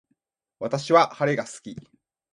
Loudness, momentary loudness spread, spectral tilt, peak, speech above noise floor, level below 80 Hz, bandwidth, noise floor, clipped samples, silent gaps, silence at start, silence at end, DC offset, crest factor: -22 LUFS; 21 LU; -5 dB/octave; -4 dBFS; 51 dB; -68 dBFS; 11.5 kHz; -74 dBFS; under 0.1%; none; 0.6 s; 0.55 s; under 0.1%; 22 dB